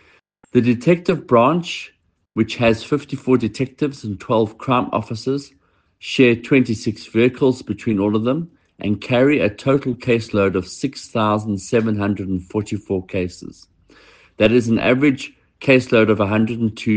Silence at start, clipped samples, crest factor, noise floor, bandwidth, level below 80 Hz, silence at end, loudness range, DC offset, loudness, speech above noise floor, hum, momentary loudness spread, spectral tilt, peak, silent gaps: 0.55 s; under 0.1%; 18 dB; -55 dBFS; 9.4 kHz; -52 dBFS; 0 s; 3 LU; under 0.1%; -19 LUFS; 37 dB; none; 11 LU; -6.5 dB/octave; 0 dBFS; none